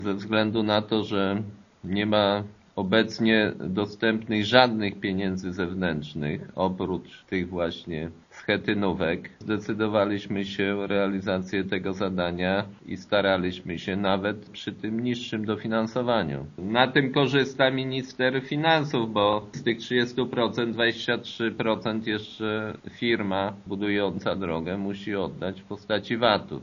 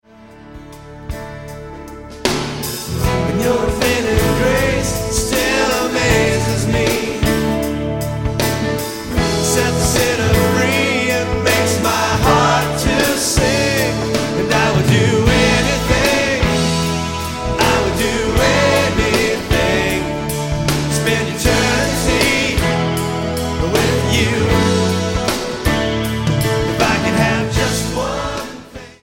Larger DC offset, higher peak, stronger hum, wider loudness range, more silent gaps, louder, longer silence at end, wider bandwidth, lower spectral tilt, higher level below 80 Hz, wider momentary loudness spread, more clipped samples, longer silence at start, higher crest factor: neither; about the same, 0 dBFS vs 0 dBFS; neither; about the same, 5 LU vs 3 LU; neither; second, -26 LUFS vs -16 LUFS; about the same, 0 s vs 0.1 s; second, 7.2 kHz vs 17 kHz; about the same, -3.5 dB/octave vs -4.5 dB/octave; second, -58 dBFS vs -28 dBFS; about the same, 9 LU vs 8 LU; neither; second, 0 s vs 0.2 s; first, 26 dB vs 16 dB